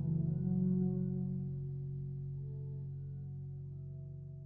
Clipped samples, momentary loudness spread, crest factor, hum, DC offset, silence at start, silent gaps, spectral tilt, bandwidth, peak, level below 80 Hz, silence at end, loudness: under 0.1%; 13 LU; 14 dB; none; under 0.1%; 0 s; none; -15.5 dB/octave; 1.6 kHz; -24 dBFS; -58 dBFS; 0 s; -39 LUFS